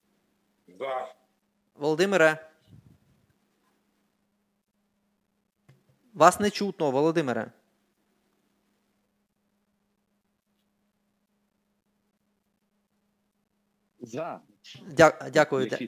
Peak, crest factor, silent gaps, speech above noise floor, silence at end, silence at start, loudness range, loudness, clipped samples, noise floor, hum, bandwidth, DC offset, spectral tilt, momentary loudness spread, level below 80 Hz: -2 dBFS; 28 dB; none; 51 dB; 0 s; 0.8 s; 17 LU; -25 LUFS; under 0.1%; -75 dBFS; none; 16 kHz; under 0.1%; -4.5 dB/octave; 18 LU; -66 dBFS